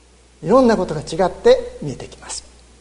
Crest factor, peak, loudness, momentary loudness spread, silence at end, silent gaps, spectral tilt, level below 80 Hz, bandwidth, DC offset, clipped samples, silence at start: 18 dB; 0 dBFS; -16 LUFS; 17 LU; 0.4 s; none; -5.5 dB/octave; -42 dBFS; 11 kHz; under 0.1%; under 0.1%; 0.4 s